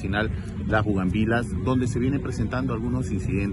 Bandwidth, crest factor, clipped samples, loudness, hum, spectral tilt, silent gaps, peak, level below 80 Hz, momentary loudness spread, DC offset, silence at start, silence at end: 11.5 kHz; 16 dB; under 0.1%; -25 LUFS; none; -7 dB/octave; none; -8 dBFS; -36 dBFS; 4 LU; under 0.1%; 0 s; 0 s